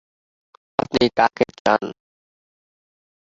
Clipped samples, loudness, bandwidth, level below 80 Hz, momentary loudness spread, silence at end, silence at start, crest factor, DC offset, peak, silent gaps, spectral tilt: under 0.1%; -20 LUFS; 7.8 kHz; -56 dBFS; 9 LU; 1.3 s; 0.9 s; 22 dB; under 0.1%; -2 dBFS; 1.60-1.65 s; -5 dB/octave